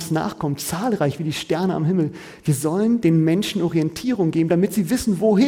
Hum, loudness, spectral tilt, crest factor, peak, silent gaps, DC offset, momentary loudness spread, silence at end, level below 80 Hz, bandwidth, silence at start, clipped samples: none; -21 LUFS; -6 dB/octave; 14 dB; -6 dBFS; none; under 0.1%; 6 LU; 0 s; -50 dBFS; 17 kHz; 0 s; under 0.1%